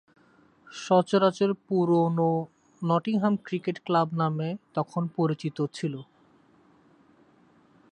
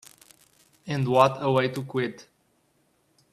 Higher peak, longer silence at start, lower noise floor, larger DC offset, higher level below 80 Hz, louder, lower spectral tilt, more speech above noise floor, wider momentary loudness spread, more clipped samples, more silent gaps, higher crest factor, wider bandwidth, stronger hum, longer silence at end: second, -8 dBFS vs -4 dBFS; second, 0.7 s vs 0.85 s; second, -60 dBFS vs -68 dBFS; neither; second, -74 dBFS vs -66 dBFS; about the same, -27 LUFS vs -25 LUFS; about the same, -7.5 dB/octave vs -6.5 dB/octave; second, 35 dB vs 44 dB; about the same, 11 LU vs 12 LU; neither; neither; about the same, 18 dB vs 22 dB; second, 9.4 kHz vs 14.5 kHz; neither; first, 1.9 s vs 1.1 s